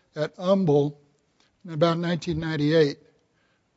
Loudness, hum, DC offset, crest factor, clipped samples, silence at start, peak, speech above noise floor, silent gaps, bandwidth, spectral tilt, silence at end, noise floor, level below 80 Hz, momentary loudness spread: -24 LUFS; none; under 0.1%; 18 dB; under 0.1%; 0.15 s; -8 dBFS; 45 dB; none; 8 kHz; -7 dB/octave; 0.8 s; -68 dBFS; -56 dBFS; 10 LU